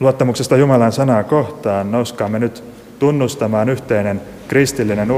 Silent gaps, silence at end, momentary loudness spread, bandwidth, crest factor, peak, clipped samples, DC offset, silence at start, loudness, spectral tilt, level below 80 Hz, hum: none; 0 s; 7 LU; 16 kHz; 14 dB; 0 dBFS; under 0.1%; under 0.1%; 0 s; -16 LUFS; -6.5 dB/octave; -48 dBFS; none